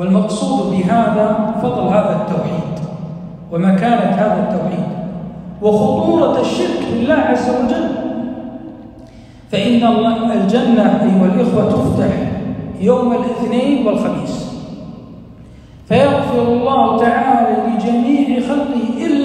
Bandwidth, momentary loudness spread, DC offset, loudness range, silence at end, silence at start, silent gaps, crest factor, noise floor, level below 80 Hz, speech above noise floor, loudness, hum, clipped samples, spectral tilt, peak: 10 kHz; 13 LU; under 0.1%; 4 LU; 0 s; 0 s; none; 14 dB; -38 dBFS; -44 dBFS; 24 dB; -15 LUFS; none; under 0.1%; -7.5 dB/octave; 0 dBFS